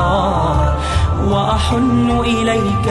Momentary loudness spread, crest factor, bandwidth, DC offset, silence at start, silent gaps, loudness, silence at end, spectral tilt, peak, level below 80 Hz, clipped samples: 2 LU; 12 dB; 11.5 kHz; under 0.1%; 0 s; none; -15 LUFS; 0 s; -6.5 dB/octave; -2 dBFS; -22 dBFS; under 0.1%